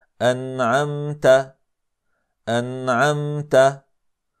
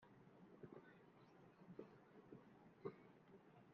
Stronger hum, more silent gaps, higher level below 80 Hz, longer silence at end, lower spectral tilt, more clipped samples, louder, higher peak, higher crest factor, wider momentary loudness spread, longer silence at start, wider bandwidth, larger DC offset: neither; neither; first, -62 dBFS vs under -90 dBFS; first, 0.6 s vs 0 s; second, -5.5 dB/octave vs -7 dB/octave; neither; first, -20 LUFS vs -63 LUFS; first, -4 dBFS vs -38 dBFS; second, 18 dB vs 26 dB; about the same, 9 LU vs 11 LU; first, 0.2 s vs 0 s; first, 14 kHz vs 6 kHz; neither